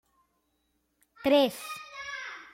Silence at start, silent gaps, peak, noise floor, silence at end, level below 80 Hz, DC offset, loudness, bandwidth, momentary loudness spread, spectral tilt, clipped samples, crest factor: 1.2 s; none; -12 dBFS; -75 dBFS; 0.1 s; -70 dBFS; under 0.1%; -29 LUFS; 16.5 kHz; 15 LU; -3.5 dB/octave; under 0.1%; 20 dB